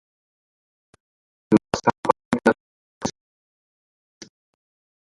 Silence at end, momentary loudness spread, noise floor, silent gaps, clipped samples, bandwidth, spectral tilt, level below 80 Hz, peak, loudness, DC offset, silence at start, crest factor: 2 s; 12 LU; under -90 dBFS; 1.98-2.03 s, 2.25-2.31 s, 2.60-3.01 s; under 0.1%; 11.5 kHz; -5.5 dB/octave; -58 dBFS; 0 dBFS; -23 LUFS; under 0.1%; 1.5 s; 26 dB